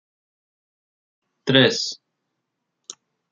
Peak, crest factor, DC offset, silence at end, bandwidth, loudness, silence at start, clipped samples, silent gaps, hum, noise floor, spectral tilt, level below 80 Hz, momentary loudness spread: 0 dBFS; 26 dB; under 0.1%; 0.4 s; 7.6 kHz; -19 LUFS; 1.45 s; under 0.1%; none; none; -79 dBFS; -4 dB/octave; -70 dBFS; 25 LU